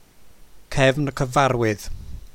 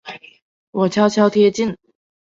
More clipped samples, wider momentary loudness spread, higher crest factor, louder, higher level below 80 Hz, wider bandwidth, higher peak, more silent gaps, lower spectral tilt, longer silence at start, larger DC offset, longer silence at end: neither; second, 15 LU vs 22 LU; about the same, 20 dB vs 16 dB; second, -21 LUFS vs -17 LUFS; first, -38 dBFS vs -60 dBFS; first, 16.5 kHz vs 7.8 kHz; about the same, -4 dBFS vs -2 dBFS; second, none vs 0.42-0.73 s; about the same, -5.5 dB/octave vs -6 dB/octave; first, 0.2 s vs 0.05 s; neither; second, 0.05 s vs 0.5 s